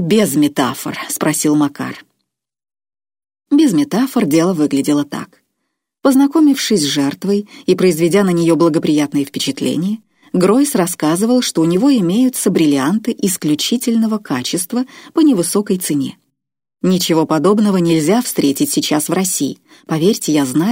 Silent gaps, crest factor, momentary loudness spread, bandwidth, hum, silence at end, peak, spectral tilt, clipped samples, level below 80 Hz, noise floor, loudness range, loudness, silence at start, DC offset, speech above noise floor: none; 14 dB; 8 LU; 16.5 kHz; none; 0 s; -2 dBFS; -5 dB/octave; under 0.1%; -62 dBFS; -74 dBFS; 3 LU; -15 LUFS; 0 s; under 0.1%; 60 dB